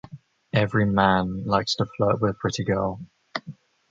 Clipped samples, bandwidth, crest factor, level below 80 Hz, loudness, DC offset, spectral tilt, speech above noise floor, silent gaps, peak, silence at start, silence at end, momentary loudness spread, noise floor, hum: under 0.1%; 7.8 kHz; 22 dB; -48 dBFS; -23 LUFS; under 0.1%; -6 dB/octave; 22 dB; none; -4 dBFS; 0.1 s; 0.35 s; 15 LU; -45 dBFS; none